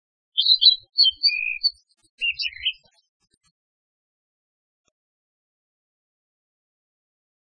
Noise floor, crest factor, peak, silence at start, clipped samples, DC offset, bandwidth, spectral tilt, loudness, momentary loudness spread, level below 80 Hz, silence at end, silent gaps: under -90 dBFS; 26 dB; -2 dBFS; 0.35 s; under 0.1%; under 0.1%; 9.8 kHz; 2 dB/octave; -19 LUFS; 13 LU; -66 dBFS; 4.85 s; 2.10-2.18 s